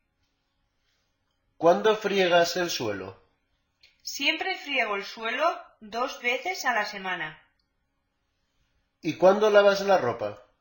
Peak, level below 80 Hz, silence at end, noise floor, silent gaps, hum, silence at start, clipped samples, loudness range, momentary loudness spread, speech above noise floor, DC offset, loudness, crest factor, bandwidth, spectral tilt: -6 dBFS; -68 dBFS; 0.2 s; -76 dBFS; none; none; 1.6 s; under 0.1%; 5 LU; 16 LU; 51 dB; under 0.1%; -25 LUFS; 22 dB; 17 kHz; -3.5 dB/octave